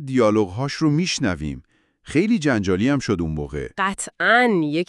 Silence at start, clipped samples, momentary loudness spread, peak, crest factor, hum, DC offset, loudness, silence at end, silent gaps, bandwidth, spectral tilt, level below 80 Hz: 0 s; under 0.1%; 11 LU; -4 dBFS; 18 dB; none; under 0.1%; -20 LUFS; 0.05 s; none; 12 kHz; -5.5 dB/octave; -44 dBFS